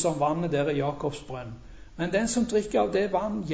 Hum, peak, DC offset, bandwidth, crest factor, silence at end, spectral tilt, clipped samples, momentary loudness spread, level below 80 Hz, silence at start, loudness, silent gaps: none; -12 dBFS; under 0.1%; 8 kHz; 14 dB; 0 s; -5.5 dB/octave; under 0.1%; 13 LU; -50 dBFS; 0 s; -27 LUFS; none